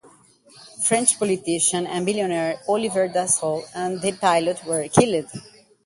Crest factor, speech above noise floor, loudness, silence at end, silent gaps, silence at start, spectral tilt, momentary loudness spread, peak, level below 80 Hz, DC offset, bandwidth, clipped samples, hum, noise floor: 22 dB; 31 dB; -21 LUFS; 0.45 s; none; 0.6 s; -3.5 dB/octave; 8 LU; 0 dBFS; -62 dBFS; under 0.1%; 11.5 kHz; under 0.1%; none; -53 dBFS